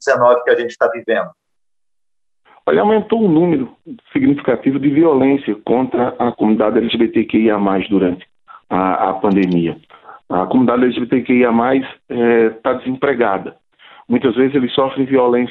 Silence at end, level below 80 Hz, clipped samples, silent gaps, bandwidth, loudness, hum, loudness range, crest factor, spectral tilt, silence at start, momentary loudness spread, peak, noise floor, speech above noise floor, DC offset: 0 s; -54 dBFS; under 0.1%; none; 8 kHz; -15 LUFS; none; 2 LU; 14 dB; -7.5 dB/octave; 0 s; 7 LU; -2 dBFS; -86 dBFS; 71 dB; under 0.1%